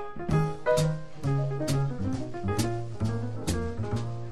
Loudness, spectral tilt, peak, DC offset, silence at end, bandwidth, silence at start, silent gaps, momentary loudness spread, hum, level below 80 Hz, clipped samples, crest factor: -30 LUFS; -6.5 dB/octave; -12 dBFS; 1%; 0 s; 16 kHz; 0 s; none; 6 LU; none; -44 dBFS; under 0.1%; 16 dB